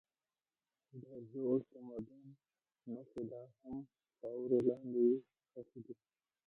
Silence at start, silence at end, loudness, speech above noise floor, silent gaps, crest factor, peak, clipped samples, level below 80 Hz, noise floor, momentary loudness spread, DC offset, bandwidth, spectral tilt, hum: 0.95 s; 0.55 s; -40 LUFS; over 50 dB; none; 20 dB; -22 dBFS; under 0.1%; -80 dBFS; under -90 dBFS; 23 LU; under 0.1%; 3.7 kHz; -11 dB/octave; none